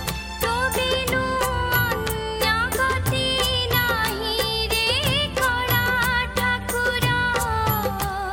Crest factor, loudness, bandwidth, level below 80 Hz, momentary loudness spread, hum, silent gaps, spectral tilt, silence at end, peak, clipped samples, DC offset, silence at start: 16 dB; -21 LUFS; 17 kHz; -36 dBFS; 4 LU; none; none; -3.5 dB/octave; 0 s; -8 dBFS; under 0.1%; under 0.1%; 0 s